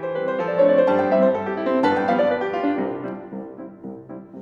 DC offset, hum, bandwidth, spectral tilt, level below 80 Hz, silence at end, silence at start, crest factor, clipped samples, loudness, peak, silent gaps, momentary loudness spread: under 0.1%; none; 6.8 kHz; -8 dB/octave; -66 dBFS; 0 s; 0 s; 14 dB; under 0.1%; -20 LUFS; -6 dBFS; none; 19 LU